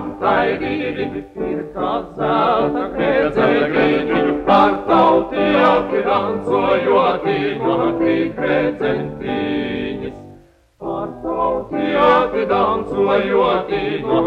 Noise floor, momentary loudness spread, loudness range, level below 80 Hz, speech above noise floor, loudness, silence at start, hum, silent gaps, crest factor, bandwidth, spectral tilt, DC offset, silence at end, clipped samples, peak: -47 dBFS; 11 LU; 6 LU; -44 dBFS; 28 dB; -17 LUFS; 0 s; none; none; 16 dB; 8.2 kHz; -7.5 dB/octave; under 0.1%; 0 s; under 0.1%; -2 dBFS